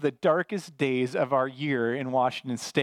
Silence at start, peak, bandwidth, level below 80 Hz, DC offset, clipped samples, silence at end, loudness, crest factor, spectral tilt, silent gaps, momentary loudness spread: 0 s; -10 dBFS; 15 kHz; -78 dBFS; under 0.1%; under 0.1%; 0 s; -27 LUFS; 18 dB; -5.5 dB/octave; none; 4 LU